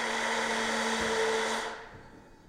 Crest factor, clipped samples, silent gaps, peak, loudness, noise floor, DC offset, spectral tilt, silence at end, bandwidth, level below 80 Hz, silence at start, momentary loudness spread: 14 dB; under 0.1%; none; -18 dBFS; -30 LUFS; -52 dBFS; under 0.1%; -1.5 dB/octave; 0.15 s; 16 kHz; -58 dBFS; 0 s; 12 LU